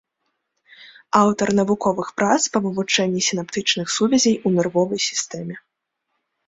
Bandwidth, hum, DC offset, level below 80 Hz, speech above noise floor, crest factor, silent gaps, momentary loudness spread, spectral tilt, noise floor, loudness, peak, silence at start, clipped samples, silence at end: 8.2 kHz; none; under 0.1%; -60 dBFS; 57 dB; 20 dB; none; 6 LU; -3.5 dB/octave; -77 dBFS; -19 LUFS; -2 dBFS; 0.8 s; under 0.1%; 0.9 s